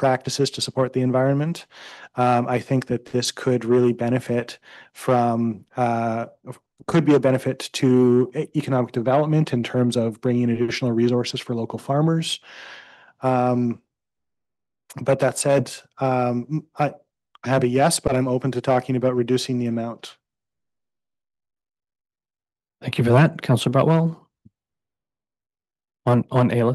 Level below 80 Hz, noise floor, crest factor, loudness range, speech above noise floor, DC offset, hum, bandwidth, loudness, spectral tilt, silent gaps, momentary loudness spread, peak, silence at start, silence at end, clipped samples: -56 dBFS; under -90 dBFS; 18 dB; 5 LU; over 69 dB; under 0.1%; none; 12.5 kHz; -21 LUFS; -6 dB/octave; none; 14 LU; -4 dBFS; 0 s; 0 s; under 0.1%